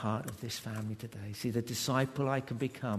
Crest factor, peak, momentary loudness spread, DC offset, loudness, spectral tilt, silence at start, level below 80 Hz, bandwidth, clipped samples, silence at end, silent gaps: 20 dB; -16 dBFS; 9 LU; under 0.1%; -36 LUFS; -5 dB/octave; 0 s; -66 dBFS; 13.5 kHz; under 0.1%; 0 s; none